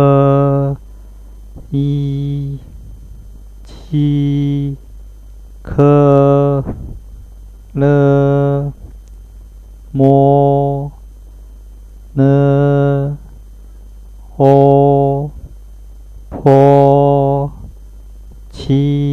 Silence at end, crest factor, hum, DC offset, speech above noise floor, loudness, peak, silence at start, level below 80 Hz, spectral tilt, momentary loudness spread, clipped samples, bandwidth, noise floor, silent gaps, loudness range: 0 s; 14 dB; 50 Hz at -35 dBFS; under 0.1%; 24 dB; -12 LUFS; 0 dBFS; 0 s; -34 dBFS; -10 dB/octave; 17 LU; under 0.1%; 4.3 kHz; -34 dBFS; none; 7 LU